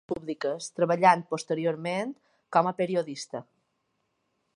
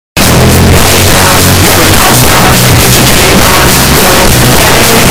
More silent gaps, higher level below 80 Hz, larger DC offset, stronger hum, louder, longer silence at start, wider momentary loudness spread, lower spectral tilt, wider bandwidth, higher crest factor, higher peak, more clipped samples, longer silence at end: neither; second, -72 dBFS vs -16 dBFS; second, under 0.1% vs 10%; neither; second, -27 LUFS vs -3 LUFS; about the same, 0.1 s vs 0.15 s; first, 15 LU vs 1 LU; first, -5 dB/octave vs -3.5 dB/octave; second, 11.5 kHz vs over 20 kHz; first, 24 dB vs 4 dB; second, -6 dBFS vs 0 dBFS; second, under 0.1% vs 3%; first, 1.15 s vs 0 s